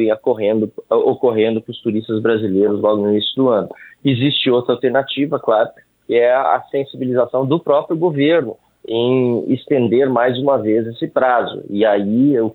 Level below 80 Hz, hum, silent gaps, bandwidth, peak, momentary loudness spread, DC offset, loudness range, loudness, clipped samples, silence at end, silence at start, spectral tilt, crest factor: -64 dBFS; none; none; 4.4 kHz; -2 dBFS; 7 LU; under 0.1%; 1 LU; -16 LUFS; under 0.1%; 0 s; 0 s; -9 dB/octave; 14 dB